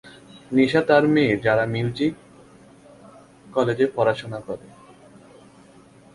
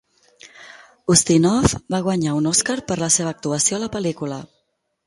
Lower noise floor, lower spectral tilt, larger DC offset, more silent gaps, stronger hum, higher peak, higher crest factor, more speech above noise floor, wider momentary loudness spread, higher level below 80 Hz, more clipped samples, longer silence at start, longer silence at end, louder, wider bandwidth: second, -50 dBFS vs -71 dBFS; first, -7 dB/octave vs -4 dB/octave; neither; neither; neither; about the same, -2 dBFS vs 0 dBFS; about the same, 20 dB vs 20 dB; second, 30 dB vs 51 dB; first, 16 LU vs 11 LU; second, -58 dBFS vs -42 dBFS; neither; second, 0.05 s vs 0.45 s; first, 1.5 s vs 0.6 s; about the same, -21 LUFS vs -19 LUFS; about the same, 11.5 kHz vs 12 kHz